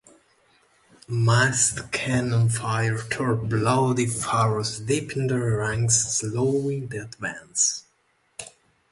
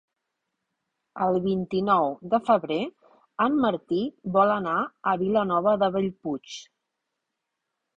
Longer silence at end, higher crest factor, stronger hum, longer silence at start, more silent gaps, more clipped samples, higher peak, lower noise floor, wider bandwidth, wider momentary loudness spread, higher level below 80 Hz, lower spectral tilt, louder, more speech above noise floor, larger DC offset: second, 0.4 s vs 1.35 s; about the same, 20 dB vs 20 dB; neither; about the same, 1.1 s vs 1.15 s; neither; neither; about the same, -6 dBFS vs -6 dBFS; second, -67 dBFS vs -83 dBFS; first, 11.5 kHz vs 7.8 kHz; about the same, 13 LU vs 11 LU; first, -52 dBFS vs -64 dBFS; second, -4 dB/octave vs -7 dB/octave; about the same, -23 LUFS vs -25 LUFS; second, 43 dB vs 58 dB; neither